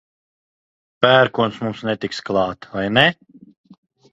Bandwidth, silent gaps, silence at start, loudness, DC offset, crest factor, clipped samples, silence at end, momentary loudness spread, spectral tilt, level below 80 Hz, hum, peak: 8.8 kHz; none; 1 s; -18 LUFS; under 0.1%; 20 dB; under 0.1%; 1 s; 11 LU; -5.5 dB/octave; -56 dBFS; none; 0 dBFS